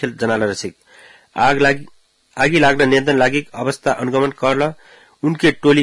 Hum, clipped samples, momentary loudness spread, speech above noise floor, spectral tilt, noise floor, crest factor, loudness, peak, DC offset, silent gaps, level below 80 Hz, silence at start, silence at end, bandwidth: none; under 0.1%; 11 LU; 30 dB; -5 dB/octave; -46 dBFS; 16 dB; -16 LUFS; -2 dBFS; under 0.1%; none; -48 dBFS; 0 s; 0 s; 12 kHz